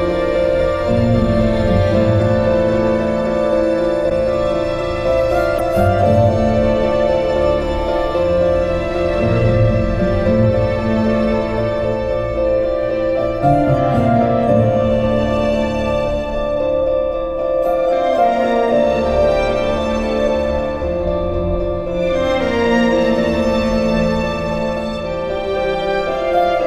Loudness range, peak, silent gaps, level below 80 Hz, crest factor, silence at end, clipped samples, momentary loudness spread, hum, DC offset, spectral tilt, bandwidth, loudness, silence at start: 2 LU; -2 dBFS; none; -28 dBFS; 14 dB; 0 s; under 0.1%; 5 LU; none; under 0.1%; -7.5 dB/octave; 12.5 kHz; -16 LUFS; 0 s